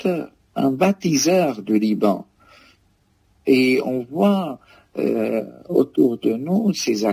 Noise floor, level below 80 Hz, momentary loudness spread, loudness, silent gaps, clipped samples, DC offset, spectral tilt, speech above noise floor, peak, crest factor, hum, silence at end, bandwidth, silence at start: -61 dBFS; -64 dBFS; 11 LU; -20 LUFS; none; under 0.1%; under 0.1%; -5.5 dB/octave; 42 dB; -4 dBFS; 16 dB; none; 0 s; 16 kHz; 0 s